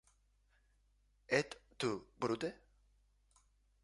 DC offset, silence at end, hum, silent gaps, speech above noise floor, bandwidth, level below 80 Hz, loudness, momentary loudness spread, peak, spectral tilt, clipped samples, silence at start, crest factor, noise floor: under 0.1%; 1.3 s; 50 Hz at -70 dBFS; none; 36 dB; 11.5 kHz; -72 dBFS; -40 LUFS; 7 LU; -18 dBFS; -4.5 dB/octave; under 0.1%; 1.3 s; 26 dB; -74 dBFS